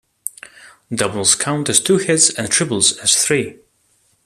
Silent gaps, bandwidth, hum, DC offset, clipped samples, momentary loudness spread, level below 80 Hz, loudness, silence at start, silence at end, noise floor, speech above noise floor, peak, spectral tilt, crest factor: none; 15 kHz; none; under 0.1%; under 0.1%; 16 LU; -58 dBFS; -15 LUFS; 0.25 s; 0.75 s; -60 dBFS; 44 dB; 0 dBFS; -2 dB/octave; 18 dB